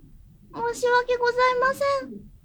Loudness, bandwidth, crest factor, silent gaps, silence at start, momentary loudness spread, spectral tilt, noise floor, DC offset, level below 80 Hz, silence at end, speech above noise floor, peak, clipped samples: -23 LUFS; 20 kHz; 16 dB; none; 0.5 s; 12 LU; -3 dB/octave; -50 dBFS; under 0.1%; -52 dBFS; 0.15 s; 27 dB; -10 dBFS; under 0.1%